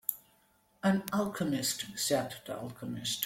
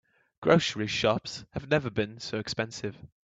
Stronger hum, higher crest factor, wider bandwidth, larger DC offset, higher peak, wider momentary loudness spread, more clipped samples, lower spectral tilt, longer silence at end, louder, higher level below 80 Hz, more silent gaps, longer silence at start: neither; about the same, 22 dB vs 22 dB; first, 16.5 kHz vs 8.4 kHz; neither; second, -12 dBFS vs -8 dBFS; second, 10 LU vs 14 LU; neither; about the same, -4 dB/octave vs -5 dB/octave; second, 0 s vs 0.15 s; second, -33 LUFS vs -29 LUFS; second, -68 dBFS vs -58 dBFS; neither; second, 0.1 s vs 0.4 s